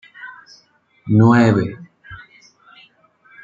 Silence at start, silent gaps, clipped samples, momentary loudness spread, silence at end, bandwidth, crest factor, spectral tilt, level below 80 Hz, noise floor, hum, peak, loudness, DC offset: 0.2 s; none; under 0.1%; 27 LU; 1.3 s; 7.6 kHz; 18 dB; -8.5 dB/octave; -56 dBFS; -57 dBFS; none; -2 dBFS; -15 LUFS; under 0.1%